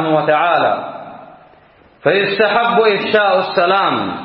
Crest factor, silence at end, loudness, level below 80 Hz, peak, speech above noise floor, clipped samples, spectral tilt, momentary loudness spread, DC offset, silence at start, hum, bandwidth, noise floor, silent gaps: 14 dB; 0 s; -14 LUFS; -60 dBFS; 0 dBFS; 33 dB; under 0.1%; -10 dB/octave; 9 LU; under 0.1%; 0 s; none; 5.8 kHz; -47 dBFS; none